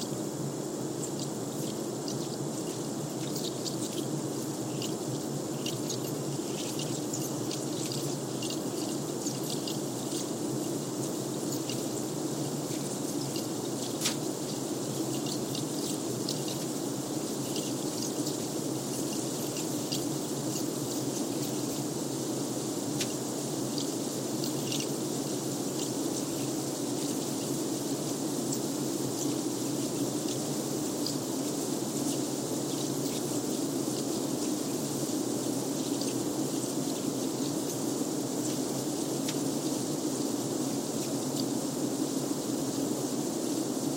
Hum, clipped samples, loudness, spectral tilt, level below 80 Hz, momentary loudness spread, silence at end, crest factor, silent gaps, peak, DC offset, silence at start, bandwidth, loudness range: none; under 0.1%; -32 LUFS; -4 dB/octave; -68 dBFS; 2 LU; 0 s; 18 dB; none; -14 dBFS; under 0.1%; 0 s; 16.5 kHz; 2 LU